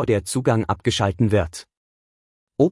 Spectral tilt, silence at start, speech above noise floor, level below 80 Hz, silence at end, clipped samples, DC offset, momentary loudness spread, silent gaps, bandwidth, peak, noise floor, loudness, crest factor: -6 dB/octave; 0 s; over 69 dB; -46 dBFS; 0 s; under 0.1%; under 0.1%; 12 LU; 1.77-2.47 s; 12 kHz; -4 dBFS; under -90 dBFS; -21 LUFS; 16 dB